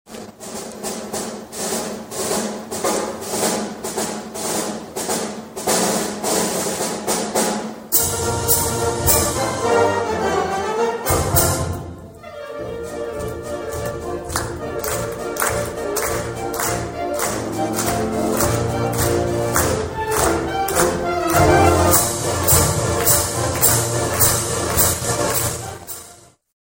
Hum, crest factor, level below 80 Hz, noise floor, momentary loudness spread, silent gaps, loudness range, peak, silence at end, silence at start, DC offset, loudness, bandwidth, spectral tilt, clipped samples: none; 20 dB; -38 dBFS; -45 dBFS; 13 LU; none; 8 LU; 0 dBFS; 0.4 s; 0.05 s; under 0.1%; -19 LUFS; 16.5 kHz; -3.5 dB/octave; under 0.1%